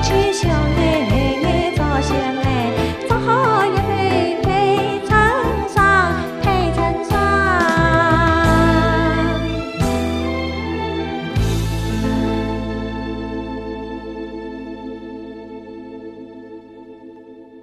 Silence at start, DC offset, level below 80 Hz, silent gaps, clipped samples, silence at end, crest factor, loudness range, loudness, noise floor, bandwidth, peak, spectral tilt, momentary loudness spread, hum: 0 s; under 0.1%; -28 dBFS; none; under 0.1%; 0 s; 16 dB; 14 LU; -17 LUFS; -40 dBFS; 14.5 kHz; -2 dBFS; -6 dB/octave; 18 LU; none